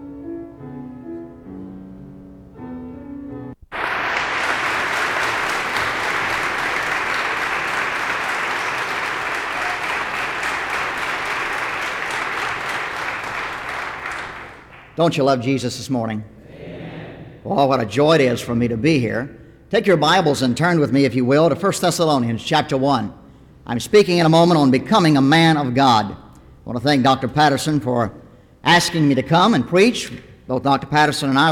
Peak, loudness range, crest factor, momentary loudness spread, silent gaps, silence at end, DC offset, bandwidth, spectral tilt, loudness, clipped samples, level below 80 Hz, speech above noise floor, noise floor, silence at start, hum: -4 dBFS; 8 LU; 16 dB; 19 LU; none; 0 s; under 0.1%; 17 kHz; -5 dB/octave; -18 LUFS; under 0.1%; -50 dBFS; 25 dB; -41 dBFS; 0 s; none